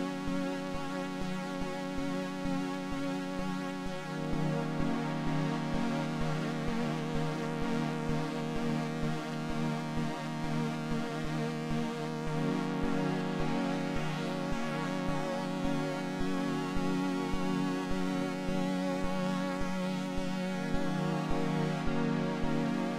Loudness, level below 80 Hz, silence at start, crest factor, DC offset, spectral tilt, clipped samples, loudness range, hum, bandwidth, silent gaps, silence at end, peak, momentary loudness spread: -34 LUFS; -48 dBFS; 0 s; 14 dB; under 0.1%; -6.5 dB/octave; under 0.1%; 2 LU; none; 15 kHz; none; 0 s; -18 dBFS; 4 LU